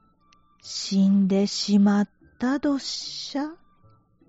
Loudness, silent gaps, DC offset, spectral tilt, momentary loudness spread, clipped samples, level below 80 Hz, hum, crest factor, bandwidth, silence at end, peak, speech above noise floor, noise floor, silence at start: -24 LUFS; none; under 0.1%; -5.5 dB/octave; 12 LU; under 0.1%; -64 dBFS; none; 14 dB; 8 kHz; 0.75 s; -10 dBFS; 38 dB; -60 dBFS; 0.65 s